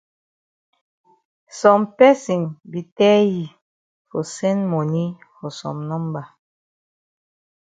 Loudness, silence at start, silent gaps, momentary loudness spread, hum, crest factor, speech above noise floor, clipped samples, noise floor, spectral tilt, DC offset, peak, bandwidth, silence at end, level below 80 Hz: -19 LUFS; 1.55 s; 2.92-2.96 s, 3.62-4.05 s; 18 LU; none; 20 dB; over 71 dB; under 0.1%; under -90 dBFS; -6.5 dB/octave; under 0.1%; 0 dBFS; 9.2 kHz; 1.5 s; -68 dBFS